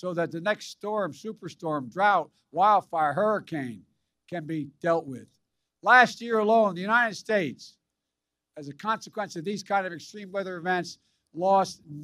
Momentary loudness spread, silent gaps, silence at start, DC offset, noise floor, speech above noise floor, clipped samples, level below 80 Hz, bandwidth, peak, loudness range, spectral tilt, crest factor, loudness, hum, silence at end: 17 LU; none; 0.05 s; under 0.1%; -86 dBFS; 59 dB; under 0.1%; -78 dBFS; 14.5 kHz; -4 dBFS; 8 LU; -5 dB/octave; 22 dB; -26 LUFS; none; 0 s